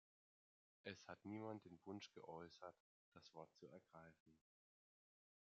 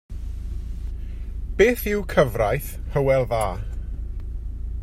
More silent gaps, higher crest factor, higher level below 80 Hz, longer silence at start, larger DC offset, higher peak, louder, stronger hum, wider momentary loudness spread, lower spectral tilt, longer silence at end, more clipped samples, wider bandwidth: first, 2.80-3.12 s, 4.20-4.26 s vs none; about the same, 24 dB vs 20 dB; second, under -90 dBFS vs -30 dBFS; first, 0.85 s vs 0.1 s; neither; second, -36 dBFS vs -4 dBFS; second, -59 LUFS vs -24 LUFS; neither; second, 12 LU vs 15 LU; second, -4.5 dB/octave vs -6 dB/octave; first, 1.1 s vs 0 s; neither; second, 7.4 kHz vs 16 kHz